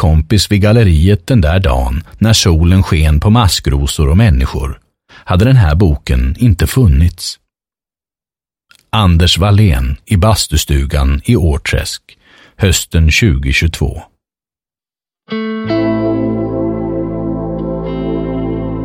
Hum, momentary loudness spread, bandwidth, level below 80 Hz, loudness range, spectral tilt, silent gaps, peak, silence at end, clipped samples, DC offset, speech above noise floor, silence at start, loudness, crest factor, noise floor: none; 10 LU; 16.5 kHz; -18 dBFS; 6 LU; -5.5 dB/octave; none; 0 dBFS; 0 s; under 0.1%; under 0.1%; over 80 dB; 0 s; -12 LUFS; 12 dB; under -90 dBFS